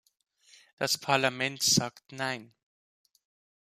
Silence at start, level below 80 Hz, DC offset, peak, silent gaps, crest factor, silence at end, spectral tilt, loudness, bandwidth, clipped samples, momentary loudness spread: 0.8 s; -70 dBFS; under 0.1%; -10 dBFS; none; 24 dB; 1.15 s; -2.5 dB/octave; -28 LUFS; 15 kHz; under 0.1%; 12 LU